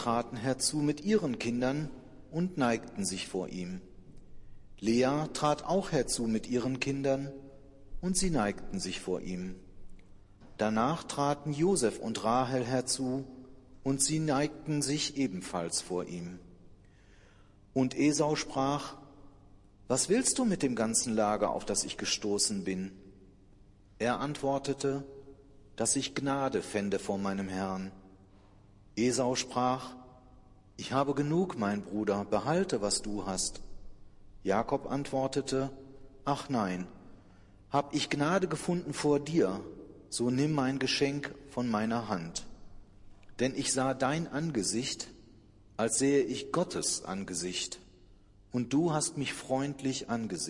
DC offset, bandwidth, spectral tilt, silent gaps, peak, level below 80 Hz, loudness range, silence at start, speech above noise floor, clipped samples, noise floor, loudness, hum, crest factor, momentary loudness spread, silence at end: under 0.1%; 12 kHz; -4 dB/octave; none; -14 dBFS; -56 dBFS; 4 LU; 0 s; 27 dB; under 0.1%; -58 dBFS; -32 LUFS; none; 20 dB; 12 LU; 0 s